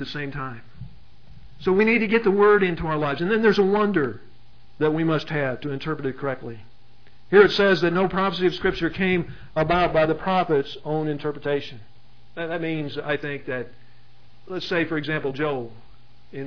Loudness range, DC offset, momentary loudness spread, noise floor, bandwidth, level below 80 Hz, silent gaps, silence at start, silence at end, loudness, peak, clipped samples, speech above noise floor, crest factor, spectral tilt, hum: 8 LU; 1%; 15 LU; -55 dBFS; 5.4 kHz; -48 dBFS; none; 0 s; 0 s; -22 LUFS; -2 dBFS; under 0.1%; 33 dB; 22 dB; -7.5 dB/octave; none